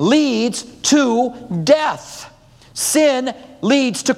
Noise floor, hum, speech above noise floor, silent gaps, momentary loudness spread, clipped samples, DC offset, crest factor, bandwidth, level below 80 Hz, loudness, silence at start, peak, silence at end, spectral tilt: -41 dBFS; none; 25 dB; none; 14 LU; under 0.1%; under 0.1%; 16 dB; 15.5 kHz; -56 dBFS; -17 LUFS; 0 s; 0 dBFS; 0 s; -3.5 dB/octave